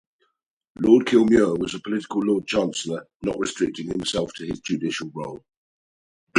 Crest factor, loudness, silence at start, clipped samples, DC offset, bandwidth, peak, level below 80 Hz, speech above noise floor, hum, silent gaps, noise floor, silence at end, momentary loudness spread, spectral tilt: 20 dB; -23 LUFS; 0.8 s; under 0.1%; under 0.1%; 11 kHz; -4 dBFS; -54 dBFS; 49 dB; none; 3.15-3.20 s, 5.57-6.27 s; -72 dBFS; 0 s; 14 LU; -5 dB/octave